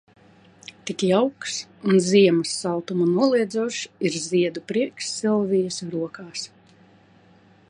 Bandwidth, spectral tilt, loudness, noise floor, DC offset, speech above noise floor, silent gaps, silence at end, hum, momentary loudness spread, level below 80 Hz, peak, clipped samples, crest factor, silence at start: 11 kHz; -5 dB/octave; -23 LUFS; -54 dBFS; under 0.1%; 32 dB; none; 1.25 s; none; 15 LU; -70 dBFS; -6 dBFS; under 0.1%; 18 dB; 0.85 s